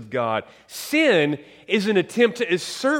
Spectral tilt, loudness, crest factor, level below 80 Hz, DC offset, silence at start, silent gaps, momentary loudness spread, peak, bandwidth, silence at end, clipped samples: -4.5 dB/octave; -21 LUFS; 18 dB; -68 dBFS; under 0.1%; 0 s; none; 12 LU; -4 dBFS; 17 kHz; 0 s; under 0.1%